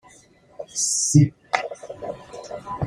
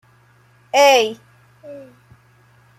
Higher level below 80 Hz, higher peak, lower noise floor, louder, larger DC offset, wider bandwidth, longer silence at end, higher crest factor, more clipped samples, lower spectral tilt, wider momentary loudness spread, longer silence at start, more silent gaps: first, -54 dBFS vs -68 dBFS; about the same, -2 dBFS vs -2 dBFS; about the same, -53 dBFS vs -53 dBFS; second, -20 LUFS vs -15 LUFS; neither; about the same, 15 kHz vs 14.5 kHz; second, 0 s vs 1 s; about the same, 22 dB vs 18 dB; neither; first, -4.5 dB/octave vs -1.5 dB/octave; second, 19 LU vs 27 LU; second, 0.6 s vs 0.75 s; neither